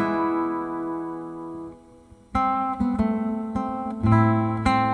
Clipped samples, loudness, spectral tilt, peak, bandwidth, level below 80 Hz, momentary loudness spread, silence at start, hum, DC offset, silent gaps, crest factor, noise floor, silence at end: under 0.1%; -24 LUFS; -8.5 dB/octave; -6 dBFS; 10 kHz; -44 dBFS; 15 LU; 0 s; none; under 0.1%; none; 18 dB; -50 dBFS; 0 s